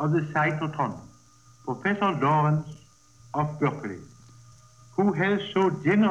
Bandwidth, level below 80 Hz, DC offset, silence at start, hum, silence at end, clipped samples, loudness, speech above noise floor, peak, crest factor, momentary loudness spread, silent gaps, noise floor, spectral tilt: 8.2 kHz; -64 dBFS; under 0.1%; 0 s; none; 0 s; under 0.1%; -26 LUFS; 31 dB; -10 dBFS; 16 dB; 14 LU; none; -56 dBFS; -7.5 dB/octave